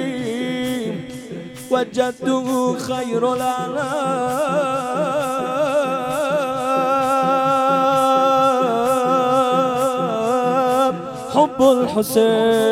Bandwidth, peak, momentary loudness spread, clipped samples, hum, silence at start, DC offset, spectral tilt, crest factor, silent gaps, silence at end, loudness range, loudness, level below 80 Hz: 16.5 kHz; -2 dBFS; 8 LU; under 0.1%; none; 0 s; under 0.1%; -5 dB/octave; 16 dB; none; 0 s; 5 LU; -18 LUFS; -58 dBFS